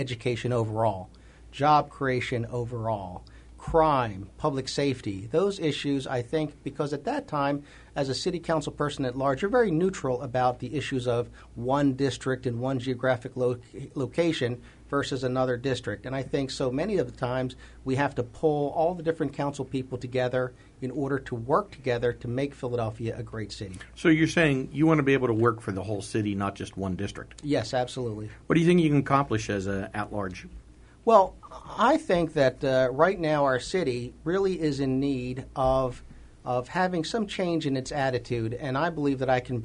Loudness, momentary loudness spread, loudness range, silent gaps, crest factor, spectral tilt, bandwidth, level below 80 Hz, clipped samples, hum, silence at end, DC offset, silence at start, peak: -27 LUFS; 11 LU; 4 LU; none; 22 dB; -6.5 dB/octave; 10.5 kHz; -50 dBFS; under 0.1%; none; 0 s; under 0.1%; 0 s; -6 dBFS